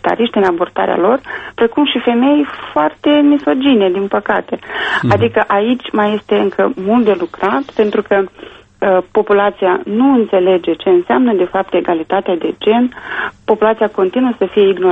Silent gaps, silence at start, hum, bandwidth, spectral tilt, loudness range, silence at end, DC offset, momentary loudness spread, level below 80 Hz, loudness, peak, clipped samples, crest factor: none; 0.05 s; none; 8 kHz; -7.5 dB/octave; 2 LU; 0 s; under 0.1%; 5 LU; -50 dBFS; -14 LUFS; 0 dBFS; under 0.1%; 14 dB